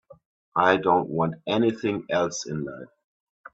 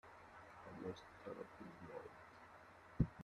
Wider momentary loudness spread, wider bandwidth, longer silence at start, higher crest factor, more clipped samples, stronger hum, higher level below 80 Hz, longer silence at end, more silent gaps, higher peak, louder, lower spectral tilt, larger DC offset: about the same, 12 LU vs 14 LU; second, 8 kHz vs 12 kHz; about the same, 0.1 s vs 0.05 s; second, 22 dB vs 28 dB; neither; neither; about the same, -64 dBFS vs -62 dBFS; first, 0.7 s vs 0 s; first, 0.25-0.52 s vs none; first, -4 dBFS vs -22 dBFS; first, -24 LUFS vs -53 LUFS; second, -5 dB/octave vs -8 dB/octave; neither